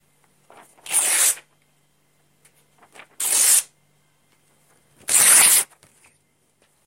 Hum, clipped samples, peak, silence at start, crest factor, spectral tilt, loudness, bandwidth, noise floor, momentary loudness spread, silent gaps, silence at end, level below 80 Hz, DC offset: none; under 0.1%; 0 dBFS; 0.85 s; 22 dB; 2.5 dB/octave; -15 LUFS; 16 kHz; -65 dBFS; 19 LU; none; 1.2 s; -74 dBFS; under 0.1%